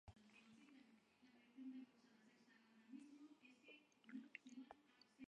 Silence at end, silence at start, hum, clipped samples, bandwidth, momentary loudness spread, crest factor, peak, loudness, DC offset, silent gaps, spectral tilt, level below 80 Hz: 0.05 s; 0.05 s; none; under 0.1%; 10 kHz; 10 LU; 26 dB; -38 dBFS; -63 LUFS; under 0.1%; none; -5 dB/octave; -86 dBFS